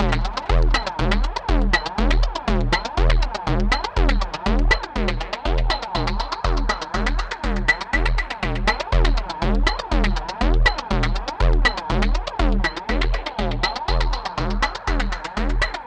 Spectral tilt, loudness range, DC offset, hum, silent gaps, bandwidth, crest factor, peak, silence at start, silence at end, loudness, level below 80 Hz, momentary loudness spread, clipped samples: -5 dB/octave; 2 LU; under 0.1%; none; none; 8.6 kHz; 18 dB; -2 dBFS; 0 s; 0 s; -22 LUFS; -22 dBFS; 5 LU; under 0.1%